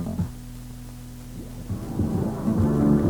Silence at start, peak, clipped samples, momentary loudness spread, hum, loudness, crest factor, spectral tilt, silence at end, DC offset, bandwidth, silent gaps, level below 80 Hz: 0 s; -8 dBFS; under 0.1%; 18 LU; none; -25 LUFS; 18 dB; -8.5 dB/octave; 0 s; under 0.1%; over 20 kHz; none; -38 dBFS